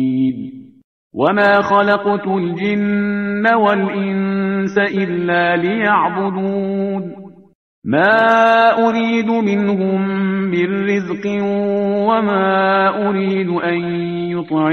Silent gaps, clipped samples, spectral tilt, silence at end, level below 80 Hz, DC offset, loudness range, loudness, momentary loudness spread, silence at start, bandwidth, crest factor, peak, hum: 0.84-1.10 s, 7.55-7.82 s; under 0.1%; -7.5 dB/octave; 0 s; -58 dBFS; under 0.1%; 3 LU; -16 LUFS; 8 LU; 0 s; 6.4 kHz; 16 dB; 0 dBFS; none